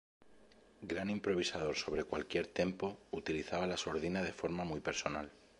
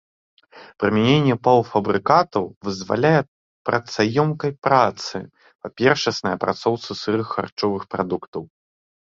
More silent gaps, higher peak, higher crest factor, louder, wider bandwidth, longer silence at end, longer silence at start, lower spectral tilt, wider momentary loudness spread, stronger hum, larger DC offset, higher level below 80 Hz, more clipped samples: second, none vs 2.56-2.61 s, 3.28-3.65 s, 4.58-4.62 s, 5.55-5.59 s, 7.52-7.57 s, 8.28-8.33 s; second, -18 dBFS vs -2 dBFS; about the same, 22 dB vs 20 dB; second, -39 LUFS vs -21 LUFS; first, 11.5 kHz vs 7.6 kHz; second, 0.25 s vs 0.7 s; second, 0.2 s vs 0.55 s; second, -4.5 dB/octave vs -6 dB/octave; second, 6 LU vs 13 LU; neither; neither; second, -62 dBFS vs -56 dBFS; neither